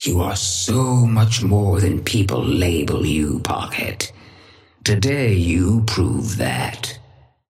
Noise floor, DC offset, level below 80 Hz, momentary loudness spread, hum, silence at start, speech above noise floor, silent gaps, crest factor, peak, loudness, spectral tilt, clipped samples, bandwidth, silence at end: -48 dBFS; under 0.1%; -36 dBFS; 8 LU; none; 0 s; 30 dB; none; 16 dB; -4 dBFS; -19 LUFS; -5 dB/octave; under 0.1%; 16 kHz; 0.5 s